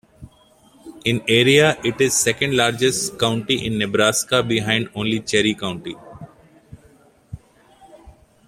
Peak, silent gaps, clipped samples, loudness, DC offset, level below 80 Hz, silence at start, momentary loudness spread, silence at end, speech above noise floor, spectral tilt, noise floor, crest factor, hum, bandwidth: 0 dBFS; none; under 0.1%; -18 LUFS; under 0.1%; -52 dBFS; 0.2 s; 10 LU; 0.4 s; 34 dB; -3.5 dB/octave; -53 dBFS; 20 dB; none; 16.5 kHz